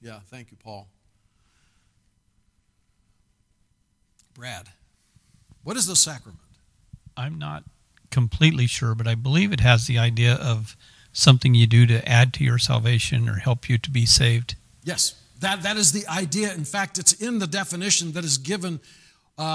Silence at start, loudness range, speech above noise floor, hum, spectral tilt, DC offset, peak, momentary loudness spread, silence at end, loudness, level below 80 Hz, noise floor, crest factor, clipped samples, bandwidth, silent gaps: 0.05 s; 8 LU; 46 dB; none; -3.5 dB/octave; under 0.1%; 0 dBFS; 19 LU; 0 s; -20 LUFS; -46 dBFS; -67 dBFS; 22 dB; under 0.1%; 11 kHz; none